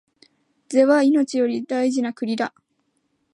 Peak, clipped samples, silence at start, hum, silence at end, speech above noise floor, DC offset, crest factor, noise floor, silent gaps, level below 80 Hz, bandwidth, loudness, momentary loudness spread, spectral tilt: -4 dBFS; under 0.1%; 0.7 s; none; 0.85 s; 51 dB; under 0.1%; 16 dB; -70 dBFS; none; -78 dBFS; 10.5 kHz; -20 LUFS; 10 LU; -4.5 dB/octave